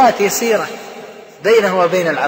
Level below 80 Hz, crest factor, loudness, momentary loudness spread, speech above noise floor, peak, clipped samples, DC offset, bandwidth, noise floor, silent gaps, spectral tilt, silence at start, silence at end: -60 dBFS; 12 dB; -14 LUFS; 20 LU; 21 dB; -2 dBFS; under 0.1%; under 0.1%; 16.5 kHz; -34 dBFS; none; -3.5 dB/octave; 0 s; 0 s